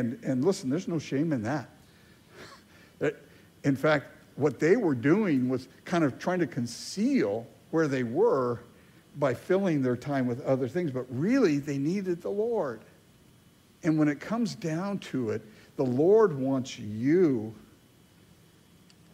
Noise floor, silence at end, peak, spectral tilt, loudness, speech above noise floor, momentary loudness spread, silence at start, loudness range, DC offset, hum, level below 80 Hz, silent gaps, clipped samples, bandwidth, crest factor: -59 dBFS; 1.6 s; -10 dBFS; -7 dB/octave; -28 LUFS; 32 dB; 10 LU; 0 s; 5 LU; under 0.1%; none; -68 dBFS; none; under 0.1%; 15.5 kHz; 18 dB